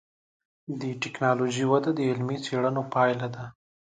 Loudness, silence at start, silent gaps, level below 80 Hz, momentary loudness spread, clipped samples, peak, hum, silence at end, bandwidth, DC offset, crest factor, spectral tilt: -27 LUFS; 0.7 s; none; -70 dBFS; 14 LU; under 0.1%; -10 dBFS; none; 0.35 s; 9.4 kHz; under 0.1%; 18 dB; -6 dB/octave